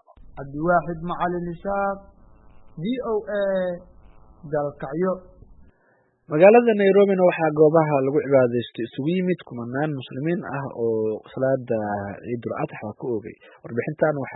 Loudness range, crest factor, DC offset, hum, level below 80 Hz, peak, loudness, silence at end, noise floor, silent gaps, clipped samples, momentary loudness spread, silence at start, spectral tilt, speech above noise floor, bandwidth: 10 LU; 22 dB; under 0.1%; none; -54 dBFS; -2 dBFS; -22 LUFS; 0 s; -63 dBFS; none; under 0.1%; 14 LU; 0.3 s; -12 dB/octave; 41 dB; 4.1 kHz